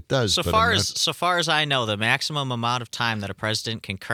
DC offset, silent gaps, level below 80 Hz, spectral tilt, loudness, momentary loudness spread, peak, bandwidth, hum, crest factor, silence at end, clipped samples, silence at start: under 0.1%; none; -54 dBFS; -3 dB/octave; -22 LUFS; 7 LU; -4 dBFS; 18.5 kHz; none; 20 dB; 0 s; under 0.1%; 0.1 s